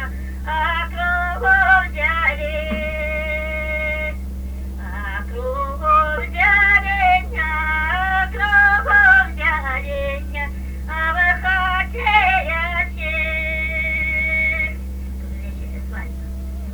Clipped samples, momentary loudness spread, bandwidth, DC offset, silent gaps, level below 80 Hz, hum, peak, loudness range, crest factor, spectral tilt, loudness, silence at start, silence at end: under 0.1%; 17 LU; over 20 kHz; under 0.1%; none; -28 dBFS; none; -2 dBFS; 7 LU; 16 dB; -5.5 dB/octave; -17 LUFS; 0 s; 0 s